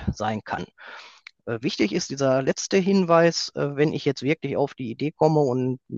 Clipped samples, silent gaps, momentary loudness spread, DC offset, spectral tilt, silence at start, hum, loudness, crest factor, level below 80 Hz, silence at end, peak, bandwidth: under 0.1%; none; 14 LU; under 0.1%; -5.5 dB/octave; 0 s; none; -23 LUFS; 20 dB; -52 dBFS; 0 s; -4 dBFS; 8 kHz